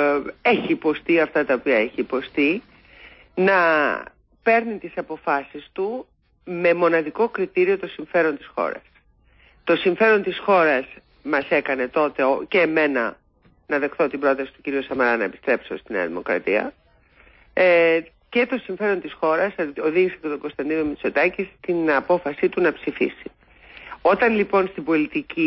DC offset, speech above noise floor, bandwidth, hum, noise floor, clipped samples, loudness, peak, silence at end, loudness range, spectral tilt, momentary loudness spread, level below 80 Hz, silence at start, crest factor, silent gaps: under 0.1%; 36 dB; 5.8 kHz; none; -57 dBFS; under 0.1%; -21 LUFS; -6 dBFS; 0 s; 2 LU; -10 dB/octave; 11 LU; -58 dBFS; 0 s; 16 dB; none